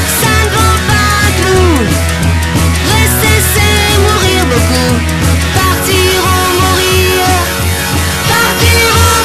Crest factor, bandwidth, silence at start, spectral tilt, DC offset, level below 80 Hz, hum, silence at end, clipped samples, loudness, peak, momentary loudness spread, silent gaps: 8 dB; 14.5 kHz; 0 s; -4 dB/octave; under 0.1%; -18 dBFS; none; 0 s; under 0.1%; -9 LUFS; 0 dBFS; 4 LU; none